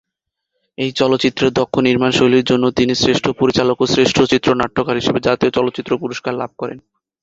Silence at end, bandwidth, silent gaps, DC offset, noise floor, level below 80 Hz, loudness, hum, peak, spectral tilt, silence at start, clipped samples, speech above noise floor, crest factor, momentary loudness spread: 0.45 s; 8 kHz; none; under 0.1%; -79 dBFS; -46 dBFS; -16 LUFS; none; 0 dBFS; -5 dB/octave; 0.8 s; under 0.1%; 64 dB; 16 dB; 9 LU